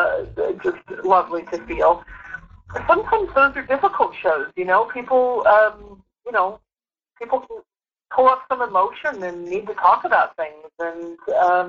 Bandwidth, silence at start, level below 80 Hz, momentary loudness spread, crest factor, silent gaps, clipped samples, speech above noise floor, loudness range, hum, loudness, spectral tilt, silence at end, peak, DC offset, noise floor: 7.2 kHz; 0 s; -50 dBFS; 14 LU; 18 dB; none; under 0.1%; over 71 dB; 4 LU; none; -20 LUFS; -6 dB/octave; 0 s; -2 dBFS; under 0.1%; under -90 dBFS